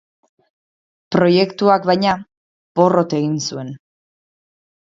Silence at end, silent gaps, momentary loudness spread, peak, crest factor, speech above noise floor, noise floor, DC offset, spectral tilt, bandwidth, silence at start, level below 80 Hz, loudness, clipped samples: 1.1 s; 2.37-2.75 s; 11 LU; 0 dBFS; 18 dB; over 74 dB; under -90 dBFS; under 0.1%; -6 dB/octave; 7.8 kHz; 1.1 s; -60 dBFS; -17 LUFS; under 0.1%